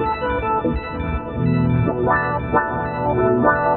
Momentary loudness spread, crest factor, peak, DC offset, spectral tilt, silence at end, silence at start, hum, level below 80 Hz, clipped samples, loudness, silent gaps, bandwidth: 8 LU; 16 dB; -4 dBFS; under 0.1%; -7 dB/octave; 0 s; 0 s; none; -34 dBFS; under 0.1%; -20 LUFS; none; 4.2 kHz